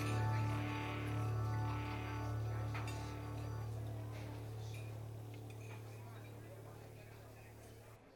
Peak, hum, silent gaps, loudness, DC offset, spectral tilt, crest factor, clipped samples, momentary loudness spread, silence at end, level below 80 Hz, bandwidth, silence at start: -28 dBFS; none; none; -44 LUFS; under 0.1%; -6.5 dB/octave; 14 dB; under 0.1%; 16 LU; 0 s; -56 dBFS; 17.5 kHz; 0 s